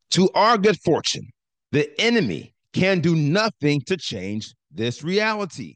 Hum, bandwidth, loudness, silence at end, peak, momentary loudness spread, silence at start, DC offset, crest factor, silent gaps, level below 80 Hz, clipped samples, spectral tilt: none; 9.8 kHz; -21 LUFS; 0.05 s; -6 dBFS; 13 LU; 0.1 s; under 0.1%; 16 dB; none; -62 dBFS; under 0.1%; -5 dB/octave